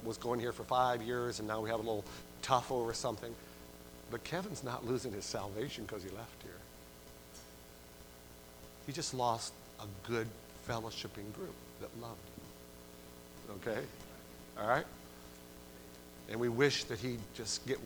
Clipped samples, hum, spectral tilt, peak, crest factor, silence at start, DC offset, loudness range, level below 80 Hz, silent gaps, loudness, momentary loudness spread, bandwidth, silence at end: under 0.1%; 60 Hz at -60 dBFS; -4 dB/octave; -14 dBFS; 26 dB; 0 s; under 0.1%; 10 LU; -62 dBFS; none; -39 LUFS; 20 LU; over 20 kHz; 0 s